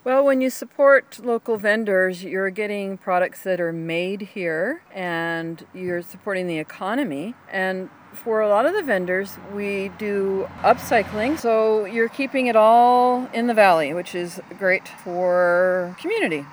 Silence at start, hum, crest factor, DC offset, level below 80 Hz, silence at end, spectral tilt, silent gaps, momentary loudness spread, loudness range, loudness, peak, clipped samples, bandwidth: 0.05 s; none; 18 dB; under 0.1%; -64 dBFS; 0 s; -5.5 dB/octave; none; 13 LU; 8 LU; -21 LUFS; -2 dBFS; under 0.1%; over 20 kHz